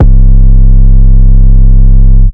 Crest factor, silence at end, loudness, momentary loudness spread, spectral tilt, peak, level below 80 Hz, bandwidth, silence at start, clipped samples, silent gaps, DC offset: 0 dB; 0 s; -7 LUFS; 0 LU; -13 dB/octave; 0 dBFS; -2 dBFS; 1.1 kHz; 0 s; 80%; none; under 0.1%